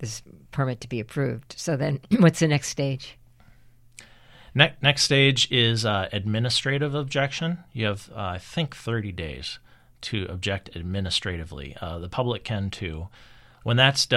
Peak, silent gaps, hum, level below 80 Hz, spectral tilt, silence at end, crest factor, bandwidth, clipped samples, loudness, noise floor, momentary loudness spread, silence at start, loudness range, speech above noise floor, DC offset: -2 dBFS; none; none; -50 dBFS; -4.5 dB/octave; 0 s; 24 dB; 13 kHz; under 0.1%; -24 LUFS; -52 dBFS; 16 LU; 0 s; 9 LU; 28 dB; under 0.1%